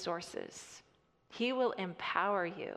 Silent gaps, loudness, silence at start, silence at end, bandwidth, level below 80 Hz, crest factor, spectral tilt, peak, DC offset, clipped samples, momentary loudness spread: none; -36 LUFS; 0 s; 0 s; 13 kHz; -78 dBFS; 20 dB; -4 dB/octave; -16 dBFS; under 0.1%; under 0.1%; 20 LU